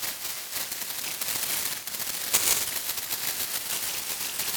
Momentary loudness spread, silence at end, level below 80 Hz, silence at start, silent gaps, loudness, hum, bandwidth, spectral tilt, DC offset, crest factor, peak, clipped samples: 7 LU; 0 s; -62 dBFS; 0 s; none; -27 LUFS; none; over 20 kHz; 1 dB/octave; under 0.1%; 26 dB; -4 dBFS; under 0.1%